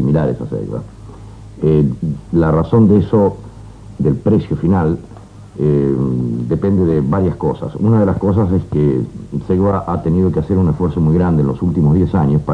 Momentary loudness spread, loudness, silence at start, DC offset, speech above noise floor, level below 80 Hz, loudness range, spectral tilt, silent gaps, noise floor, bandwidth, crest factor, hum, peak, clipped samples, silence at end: 11 LU; -15 LUFS; 0 s; under 0.1%; 20 dB; -34 dBFS; 2 LU; -10.5 dB/octave; none; -34 dBFS; 5.4 kHz; 12 dB; none; -2 dBFS; under 0.1%; 0 s